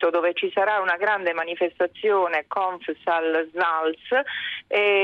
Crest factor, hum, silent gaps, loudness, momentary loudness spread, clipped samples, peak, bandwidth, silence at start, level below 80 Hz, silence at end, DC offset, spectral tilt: 14 dB; none; none; -23 LUFS; 5 LU; under 0.1%; -10 dBFS; 5.6 kHz; 0 s; -72 dBFS; 0 s; under 0.1%; -5 dB/octave